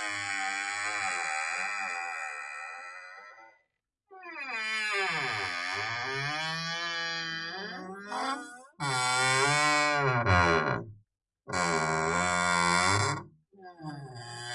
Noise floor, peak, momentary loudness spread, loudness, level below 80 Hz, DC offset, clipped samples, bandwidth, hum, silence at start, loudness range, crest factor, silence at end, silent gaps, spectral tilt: -79 dBFS; -10 dBFS; 18 LU; -29 LUFS; -64 dBFS; under 0.1%; under 0.1%; 11.5 kHz; none; 0 s; 8 LU; 22 dB; 0 s; none; -3 dB/octave